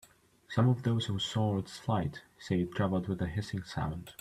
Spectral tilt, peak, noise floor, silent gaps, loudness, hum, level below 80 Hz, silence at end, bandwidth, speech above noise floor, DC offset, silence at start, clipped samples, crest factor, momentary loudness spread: -6.5 dB/octave; -16 dBFS; -53 dBFS; none; -33 LUFS; none; -56 dBFS; 0.1 s; 13.5 kHz; 21 dB; under 0.1%; 0.5 s; under 0.1%; 16 dB; 9 LU